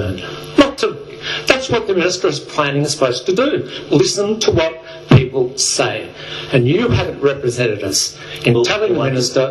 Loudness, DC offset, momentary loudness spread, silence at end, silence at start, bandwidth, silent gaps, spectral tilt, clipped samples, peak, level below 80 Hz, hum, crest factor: -16 LUFS; under 0.1%; 7 LU; 0 s; 0 s; 13 kHz; none; -4.5 dB/octave; under 0.1%; 0 dBFS; -42 dBFS; none; 16 dB